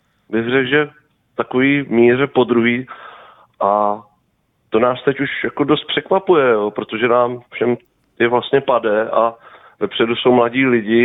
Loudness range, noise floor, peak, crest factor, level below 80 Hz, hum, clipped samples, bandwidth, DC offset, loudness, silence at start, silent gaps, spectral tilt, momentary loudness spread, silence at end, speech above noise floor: 2 LU; -64 dBFS; -2 dBFS; 16 dB; -58 dBFS; none; under 0.1%; 4 kHz; under 0.1%; -16 LUFS; 0.3 s; none; -9 dB/octave; 10 LU; 0 s; 48 dB